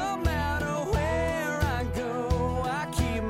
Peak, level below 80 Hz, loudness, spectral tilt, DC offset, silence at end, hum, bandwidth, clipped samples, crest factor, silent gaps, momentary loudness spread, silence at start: -14 dBFS; -36 dBFS; -28 LUFS; -6 dB/octave; under 0.1%; 0 s; none; 16 kHz; under 0.1%; 12 dB; none; 2 LU; 0 s